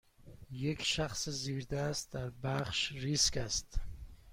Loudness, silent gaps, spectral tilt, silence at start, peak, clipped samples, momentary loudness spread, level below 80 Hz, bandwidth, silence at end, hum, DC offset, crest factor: -35 LUFS; none; -3 dB/octave; 0.2 s; -18 dBFS; under 0.1%; 15 LU; -48 dBFS; 16.5 kHz; 0 s; none; under 0.1%; 20 dB